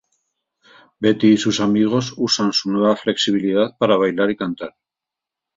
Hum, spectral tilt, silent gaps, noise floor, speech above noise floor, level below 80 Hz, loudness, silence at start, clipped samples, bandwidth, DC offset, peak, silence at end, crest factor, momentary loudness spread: none; -5 dB/octave; none; -86 dBFS; 69 dB; -60 dBFS; -18 LUFS; 1 s; under 0.1%; 7.8 kHz; under 0.1%; -2 dBFS; 0.9 s; 18 dB; 7 LU